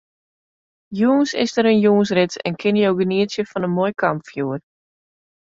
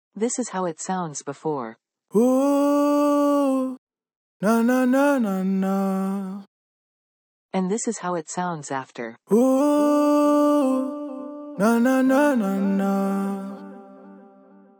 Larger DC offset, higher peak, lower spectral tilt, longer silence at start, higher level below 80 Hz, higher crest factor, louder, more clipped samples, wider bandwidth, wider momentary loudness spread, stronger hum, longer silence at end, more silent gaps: neither; first, -4 dBFS vs -8 dBFS; about the same, -6 dB/octave vs -6 dB/octave; first, 0.9 s vs 0.15 s; first, -62 dBFS vs under -90 dBFS; about the same, 16 dB vs 14 dB; first, -19 LUFS vs -22 LUFS; neither; second, 7.8 kHz vs 19.5 kHz; second, 10 LU vs 14 LU; neither; first, 0.9 s vs 0.6 s; second, none vs 3.78-3.87 s, 4.16-4.40 s, 6.47-7.49 s